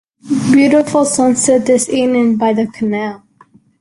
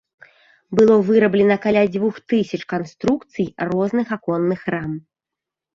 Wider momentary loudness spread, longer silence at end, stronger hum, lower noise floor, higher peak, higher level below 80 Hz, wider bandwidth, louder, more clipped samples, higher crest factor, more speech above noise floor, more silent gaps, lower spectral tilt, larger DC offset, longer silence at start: second, 8 LU vs 11 LU; about the same, 0.65 s vs 0.75 s; neither; second, -48 dBFS vs -86 dBFS; about the same, -2 dBFS vs -4 dBFS; about the same, -54 dBFS vs -56 dBFS; first, 11.5 kHz vs 7.4 kHz; first, -13 LUFS vs -19 LUFS; neither; about the same, 12 dB vs 16 dB; second, 36 dB vs 68 dB; neither; second, -4.5 dB/octave vs -7.5 dB/octave; neither; second, 0.25 s vs 0.7 s